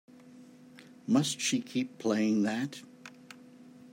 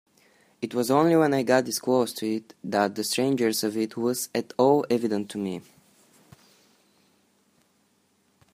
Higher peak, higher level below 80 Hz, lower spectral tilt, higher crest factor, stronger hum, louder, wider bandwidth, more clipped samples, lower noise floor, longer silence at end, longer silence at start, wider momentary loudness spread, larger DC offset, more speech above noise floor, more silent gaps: second, -14 dBFS vs -6 dBFS; second, -82 dBFS vs -72 dBFS; about the same, -4 dB/octave vs -4.5 dB/octave; about the same, 18 dB vs 22 dB; neither; second, -30 LUFS vs -25 LUFS; about the same, 16 kHz vs 15.5 kHz; neither; second, -54 dBFS vs -67 dBFS; second, 0.05 s vs 2.95 s; second, 0.25 s vs 0.6 s; first, 23 LU vs 11 LU; neither; second, 24 dB vs 43 dB; neither